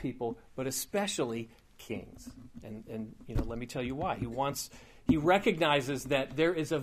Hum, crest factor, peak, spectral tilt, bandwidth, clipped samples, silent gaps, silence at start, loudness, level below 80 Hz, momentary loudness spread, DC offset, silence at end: none; 20 dB; -12 dBFS; -4.5 dB/octave; 15.5 kHz; under 0.1%; none; 0 s; -32 LUFS; -48 dBFS; 19 LU; under 0.1%; 0 s